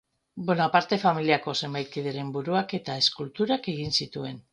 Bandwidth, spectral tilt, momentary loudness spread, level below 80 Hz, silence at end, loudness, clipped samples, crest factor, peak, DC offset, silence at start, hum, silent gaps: 10.5 kHz; -5 dB/octave; 9 LU; -64 dBFS; 0.1 s; -26 LUFS; under 0.1%; 20 dB; -6 dBFS; under 0.1%; 0.35 s; none; none